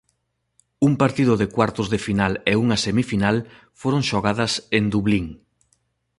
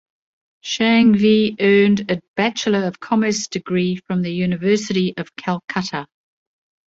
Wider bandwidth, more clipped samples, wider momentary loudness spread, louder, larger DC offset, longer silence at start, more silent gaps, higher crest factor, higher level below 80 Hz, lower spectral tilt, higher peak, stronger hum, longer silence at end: first, 11.5 kHz vs 7.8 kHz; neither; second, 6 LU vs 11 LU; second, -21 LUFS vs -18 LUFS; neither; first, 0.8 s vs 0.65 s; second, none vs 2.28-2.34 s; about the same, 18 dB vs 16 dB; first, -46 dBFS vs -58 dBFS; about the same, -5.5 dB/octave vs -5.5 dB/octave; about the same, -2 dBFS vs -2 dBFS; neither; about the same, 0.85 s vs 0.8 s